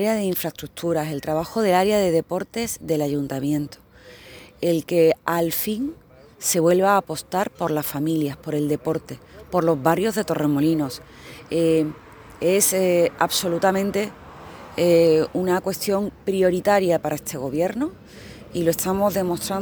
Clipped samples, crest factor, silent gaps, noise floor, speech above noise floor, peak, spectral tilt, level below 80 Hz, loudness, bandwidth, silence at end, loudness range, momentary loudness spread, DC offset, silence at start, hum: under 0.1%; 18 dB; none; -45 dBFS; 24 dB; -4 dBFS; -5 dB/octave; -54 dBFS; -22 LUFS; over 20 kHz; 0 s; 3 LU; 12 LU; under 0.1%; 0 s; none